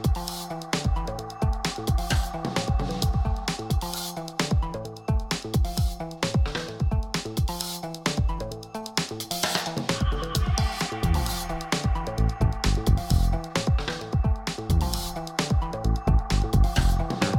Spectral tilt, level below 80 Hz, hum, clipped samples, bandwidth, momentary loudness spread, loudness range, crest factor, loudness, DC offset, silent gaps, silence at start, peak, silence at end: -5 dB/octave; -28 dBFS; none; under 0.1%; 17.5 kHz; 6 LU; 2 LU; 18 dB; -27 LUFS; under 0.1%; none; 0 s; -8 dBFS; 0 s